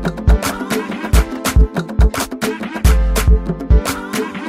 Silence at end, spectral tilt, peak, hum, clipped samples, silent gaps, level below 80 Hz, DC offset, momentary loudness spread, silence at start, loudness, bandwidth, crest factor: 0 s; -5.5 dB/octave; 0 dBFS; none; under 0.1%; none; -16 dBFS; under 0.1%; 6 LU; 0 s; -17 LUFS; 16 kHz; 14 dB